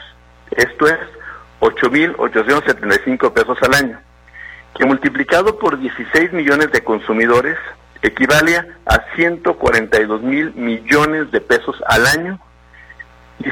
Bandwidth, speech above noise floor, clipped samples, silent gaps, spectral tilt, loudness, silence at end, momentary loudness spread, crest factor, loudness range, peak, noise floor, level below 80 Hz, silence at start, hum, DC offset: 18 kHz; 28 dB; under 0.1%; none; -4.5 dB/octave; -14 LUFS; 0 s; 11 LU; 16 dB; 1 LU; 0 dBFS; -42 dBFS; -38 dBFS; 0 s; 60 Hz at -50 dBFS; under 0.1%